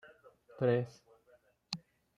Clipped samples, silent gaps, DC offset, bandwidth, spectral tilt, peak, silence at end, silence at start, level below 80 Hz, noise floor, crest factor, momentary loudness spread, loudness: under 0.1%; none; under 0.1%; 10.5 kHz; -6.5 dB/octave; -16 dBFS; 0.4 s; 0.05 s; -78 dBFS; -69 dBFS; 22 dB; 12 LU; -36 LUFS